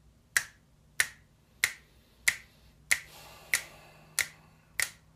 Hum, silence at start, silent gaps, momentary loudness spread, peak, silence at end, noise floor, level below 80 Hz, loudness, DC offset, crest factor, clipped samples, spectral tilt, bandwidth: none; 0.35 s; none; 17 LU; -8 dBFS; 0.25 s; -61 dBFS; -64 dBFS; -32 LUFS; under 0.1%; 28 dB; under 0.1%; 1.5 dB/octave; 15 kHz